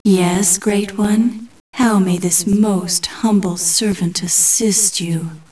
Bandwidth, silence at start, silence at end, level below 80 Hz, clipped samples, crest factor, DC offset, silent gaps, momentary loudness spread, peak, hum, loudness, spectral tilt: 11 kHz; 0.05 s; 0.1 s; -50 dBFS; under 0.1%; 14 dB; 0.4%; 1.60-1.73 s; 8 LU; 0 dBFS; none; -15 LUFS; -4 dB/octave